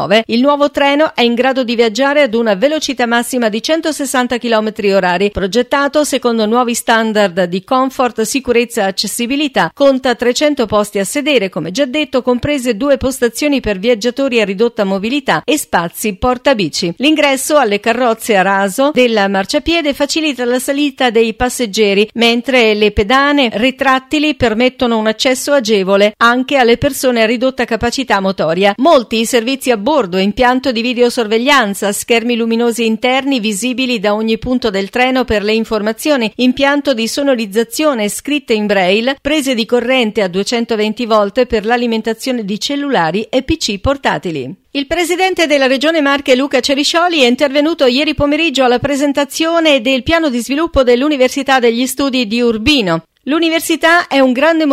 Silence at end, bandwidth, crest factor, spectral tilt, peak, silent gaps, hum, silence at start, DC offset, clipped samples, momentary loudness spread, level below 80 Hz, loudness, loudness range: 0 s; 16 kHz; 12 dB; -3.5 dB/octave; 0 dBFS; none; none; 0 s; under 0.1%; under 0.1%; 5 LU; -38 dBFS; -13 LUFS; 3 LU